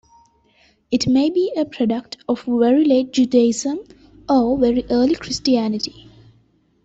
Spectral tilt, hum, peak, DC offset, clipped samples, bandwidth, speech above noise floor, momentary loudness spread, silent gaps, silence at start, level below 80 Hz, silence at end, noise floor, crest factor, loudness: -5 dB/octave; none; -4 dBFS; under 0.1%; under 0.1%; 8 kHz; 41 dB; 10 LU; none; 0.9 s; -50 dBFS; 0.95 s; -58 dBFS; 14 dB; -18 LUFS